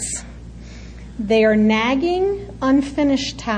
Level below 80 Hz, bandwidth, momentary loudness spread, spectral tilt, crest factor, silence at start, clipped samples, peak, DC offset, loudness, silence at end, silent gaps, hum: -38 dBFS; 10.5 kHz; 22 LU; -4.5 dB/octave; 14 dB; 0 s; under 0.1%; -6 dBFS; under 0.1%; -18 LUFS; 0 s; none; none